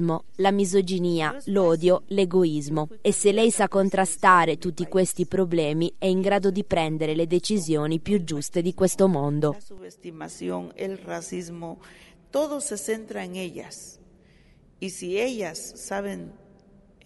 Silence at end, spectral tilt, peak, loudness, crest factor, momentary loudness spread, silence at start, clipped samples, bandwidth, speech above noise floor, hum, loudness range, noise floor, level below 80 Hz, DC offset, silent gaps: 0 s; -5 dB/octave; -4 dBFS; -24 LUFS; 22 dB; 16 LU; 0 s; under 0.1%; 11.5 kHz; 31 dB; none; 11 LU; -55 dBFS; -56 dBFS; under 0.1%; none